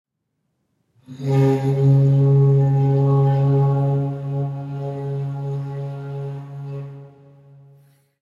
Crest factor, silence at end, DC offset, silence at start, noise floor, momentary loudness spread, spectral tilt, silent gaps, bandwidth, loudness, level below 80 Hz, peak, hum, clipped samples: 14 dB; 1.15 s; under 0.1%; 1.1 s; -74 dBFS; 16 LU; -10.5 dB/octave; none; 4.1 kHz; -19 LUFS; -58 dBFS; -6 dBFS; none; under 0.1%